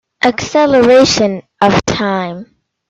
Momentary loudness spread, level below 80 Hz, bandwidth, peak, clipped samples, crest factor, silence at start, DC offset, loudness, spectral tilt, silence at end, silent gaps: 11 LU; -42 dBFS; 8.4 kHz; 0 dBFS; under 0.1%; 12 dB; 0.2 s; under 0.1%; -11 LUFS; -4.5 dB/octave; 0.45 s; none